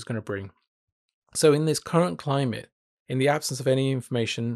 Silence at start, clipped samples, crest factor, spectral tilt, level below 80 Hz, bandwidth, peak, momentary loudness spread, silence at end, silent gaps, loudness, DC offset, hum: 0 s; under 0.1%; 18 dB; -5 dB/octave; -68 dBFS; 13.5 kHz; -8 dBFS; 13 LU; 0 s; 0.68-1.08 s, 1.14-1.22 s, 2.72-3.06 s; -25 LUFS; under 0.1%; none